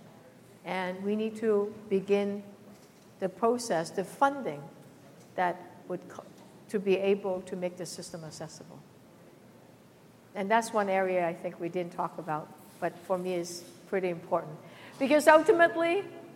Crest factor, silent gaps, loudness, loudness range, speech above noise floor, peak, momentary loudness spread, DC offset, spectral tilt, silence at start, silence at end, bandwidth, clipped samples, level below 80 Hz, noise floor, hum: 24 dB; none; -30 LUFS; 7 LU; 27 dB; -6 dBFS; 20 LU; under 0.1%; -5 dB/octave; 0.05 s; 0 s; 16.5 kHz; under 0.1%; -78 dBFS; -56 dBFS; none